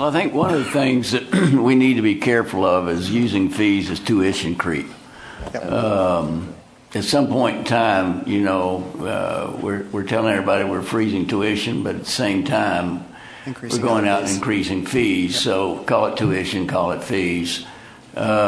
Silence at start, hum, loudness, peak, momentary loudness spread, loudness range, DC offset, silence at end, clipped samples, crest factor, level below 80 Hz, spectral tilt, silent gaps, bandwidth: 0 s; none; -20 LUFS; -4 dBFS; 10 LU; 4 LU; under 0.1%; 0 s; under 0.1%; 16 dB; -50 dBFS; -5.5 dB/octave; none; 11 kHz